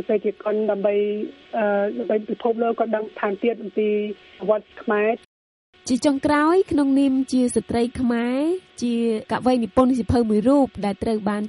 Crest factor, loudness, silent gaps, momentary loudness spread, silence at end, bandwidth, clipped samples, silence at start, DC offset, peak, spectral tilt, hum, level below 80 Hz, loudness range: 16 dB; -22 LUFS; 5.25-5.73 s; 7 LU; 0 s; 11.5 kHz; under 0.1%; 0 s; under 0.1%; -4 dBFS; -6 dB/octave; none; -48 dBFS; 3 LU